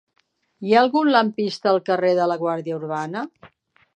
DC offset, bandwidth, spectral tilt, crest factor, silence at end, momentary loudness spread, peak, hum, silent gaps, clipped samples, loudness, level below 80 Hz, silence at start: under 0.1%; 9.4 kHz; -6 dB/octave; 18 dB; 0.5 s; 13 LU; -2 dBFS; none; none; under 0.1%; -20 LUFS; -76 dBFS; 0.6 s